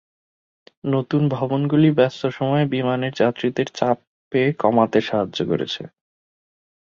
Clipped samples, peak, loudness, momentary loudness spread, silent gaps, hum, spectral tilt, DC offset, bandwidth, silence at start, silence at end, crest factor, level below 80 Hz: under 0.1%; -2 dBFS; -21 LUFS; 8 LU; 4.07-4.31 s; none; -7.5 dB/octave; under 0.1%; 7.4 kHz; 0.85 s; 1.05 s; 20 dB; -60 dBFS